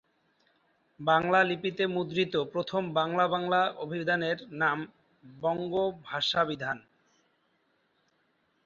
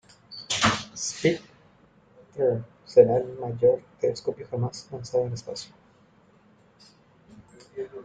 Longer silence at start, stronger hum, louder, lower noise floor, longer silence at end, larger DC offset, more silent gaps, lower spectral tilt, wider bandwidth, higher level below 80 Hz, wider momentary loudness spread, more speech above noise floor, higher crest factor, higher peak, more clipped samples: first, 1 s vs 0.3 s; neither; second, -29 LUFS vs -25 LUFS; first, -72 dBFS vs -59 dBFS; first, 1.85 s vs 0 s; neither; neither; about the same, -5.5 dB/octave vs -4.5 dB/octave; second, 7.4 kHz vs 9.4 kHz; second, -70 dBFS vs -60 dBFS; second, 9 LU vs 18 LU; first, 44 dB vs 34 dB; about the same, 20 dB vs 24 dB; second, -12 dBFS vs -4 dBFS; neither